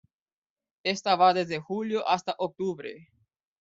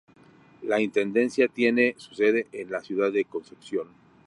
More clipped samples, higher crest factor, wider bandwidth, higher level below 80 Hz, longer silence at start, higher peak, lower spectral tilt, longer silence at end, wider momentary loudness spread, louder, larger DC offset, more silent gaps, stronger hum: neither; about the same, 20 dB vs 18 dB; second, 7.8 kHz vs 11 kHz; about the same, -74 dBFS vs -74 dBFS; first, 0.85 s vs 0.6 s; about the same, -8 dBFS vs -8 dBFS; about the same, -4.5 dB/octave vs -5.5 dB/octave; first, 0.6 s vs 0.4 s; about the same, 11 LU vs 11 LU; about the same, -27 LUFS vs -25 LUFS; neither; neither; neither